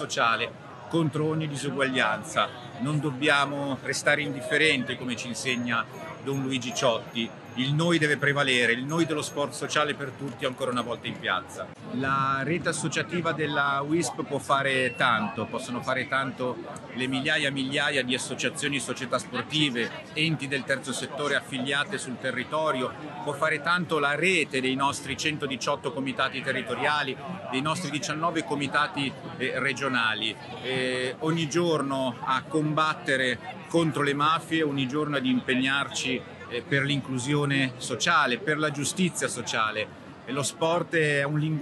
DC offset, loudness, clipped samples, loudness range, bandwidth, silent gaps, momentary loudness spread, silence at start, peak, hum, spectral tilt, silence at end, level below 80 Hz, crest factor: under 0.1%; -27 LUFS; under 0.1%; 3 LU; 12.5 kHz; none; 9 LU; 0 s; -8 dBFS; none; -4 dB/octave; 0 s; -68 dBFS; 20 dB